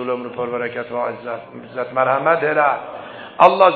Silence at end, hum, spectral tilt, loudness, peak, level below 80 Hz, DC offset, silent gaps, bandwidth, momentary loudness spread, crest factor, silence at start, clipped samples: 0 s; none; -7 dB/octave; -19 LUFS; 0 dBFS; -64 dBFS; under 0.1%; none; 6.6 kHz; 17 LU; 18 dB; 0 s; under 0.1%